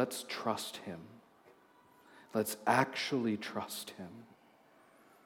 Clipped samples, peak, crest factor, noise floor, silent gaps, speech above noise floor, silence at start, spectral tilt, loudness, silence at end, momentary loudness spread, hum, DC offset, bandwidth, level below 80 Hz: under 0.1%; -14 dBFS; 26 dB; -64 dBFS; none; 28 dB; 0 s; -4 dB/octave; -36 LUFS; 1 s; 19 LU; none; under 0.1%; 17.5 kHz; -84 dBFS